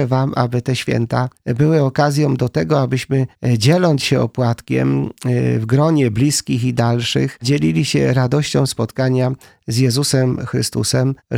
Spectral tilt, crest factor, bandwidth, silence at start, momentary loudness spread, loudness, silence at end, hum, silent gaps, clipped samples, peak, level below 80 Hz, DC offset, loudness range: -6 dB/octave; 16 dB; 15.5 kHz; 0 s; 5 LU; -17 LUFS; 0 s; none; none; under 0.1%; 0 dBFS; -48 dBFS; under 0.1%; 1 LU